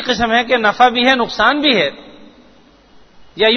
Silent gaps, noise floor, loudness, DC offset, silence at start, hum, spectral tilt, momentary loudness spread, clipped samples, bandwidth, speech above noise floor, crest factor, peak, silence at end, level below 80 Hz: none; -47 dBFS; -13 LUFS; under 0.1%; 0 s; none; -3.5 dB/octave; 4 LU; under 0.1%; 6.6 kHz; 34 dB; 16 dB; 0 dBFS; 0 s; -46 dBFS